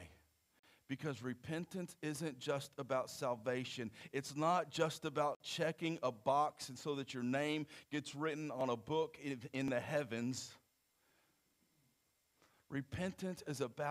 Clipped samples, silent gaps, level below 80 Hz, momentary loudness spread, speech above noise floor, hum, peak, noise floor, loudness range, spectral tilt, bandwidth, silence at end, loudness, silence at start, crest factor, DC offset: under 0.1%; 0.59-0.63 s, 5.36-5.40 s; -76 dBFS; 9 LU; 39 dB; none; -22 dBFS; -80 dBFS; 8 LU; -5 dB/octave; 15.5 kHz; 0 s; -41 LUFS; 0 s; 20 dB; under 0.1%